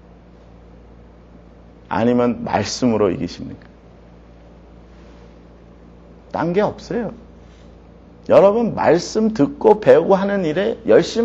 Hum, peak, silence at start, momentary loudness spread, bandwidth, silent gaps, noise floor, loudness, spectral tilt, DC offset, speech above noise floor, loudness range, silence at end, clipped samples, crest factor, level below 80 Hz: none; 0 dBFS; 1.9 s; 14 LU; 8 kHz; none; -44 dBFS; -17 LUFS; -6 dB/octave; under 0.1%; 28 dB; 12 LU; 0 s; under 0.1%; 18 dB; -46 dBFS